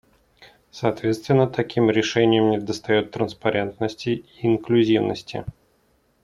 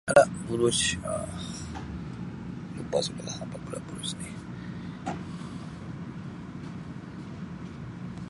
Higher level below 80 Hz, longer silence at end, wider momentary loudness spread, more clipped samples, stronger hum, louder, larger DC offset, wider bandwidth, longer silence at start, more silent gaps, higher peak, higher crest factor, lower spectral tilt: second, -58 dBFS vs -52 dBFS; first, 0.7 s vs 0 s; second, 9 LU vs 14 LU; neither; neither; first, -22 LUFS vs -32 LUFS; neither; about the same, 11.5 kHz vs 11.5 kHz; first, 0.4 s vs 0.05 s; neither; about the same, -4 dBFS vs -6 dBFS; second, 18 dB vs 26 dB; first, -6.5 dB/octave vs -4 dB/octave